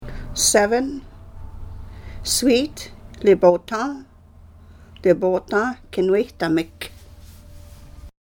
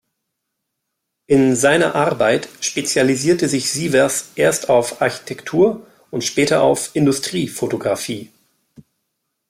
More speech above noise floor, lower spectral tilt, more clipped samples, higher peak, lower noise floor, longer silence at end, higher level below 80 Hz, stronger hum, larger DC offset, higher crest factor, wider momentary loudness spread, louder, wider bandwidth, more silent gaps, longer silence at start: second, 27 dB vs 60 dB; about the same, -3.5 dB/octave vs -4 dB/octave; neither; about the same, -2 dBFS vs -2 dBFS; second, -46 dBFS vs -77 dBFS; second, 0.15 s vs 1.25 s; first, -40 dBFS vs -58 dBFS; neither; neither; about the same, 20 dB vs 16 dB; first, 23 LU vs 8 LU; second, -20 LUFS vs -17 LUFS; about the same, 17.5 kHz vs 16 kHz; neither; second, 0 s vs 1.3 s